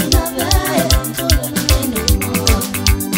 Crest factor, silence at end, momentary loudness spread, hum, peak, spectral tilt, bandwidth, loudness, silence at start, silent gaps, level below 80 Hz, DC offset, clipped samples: 14 dB; 0 s; 2 LU; none; 0 dBFS; -4 dB/octave; 16.5 kHz; -15 LUFS; 0 s; none; -20 dBFS; under 0.1%; under 0.1%